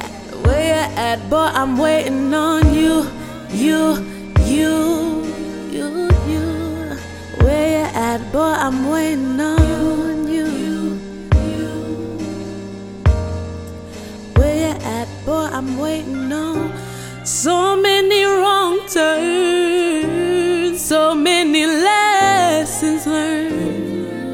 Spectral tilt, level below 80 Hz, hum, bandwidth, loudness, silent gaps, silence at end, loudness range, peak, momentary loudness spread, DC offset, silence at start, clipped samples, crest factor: -5 dB/octave; -28 dBFS; none; 17.5 kHz; -17 LUFS; none; 0 s; 6 LU; 0 dBFS; 12 LU; under 0.1%; 0 s; under 0.1%; 16 dB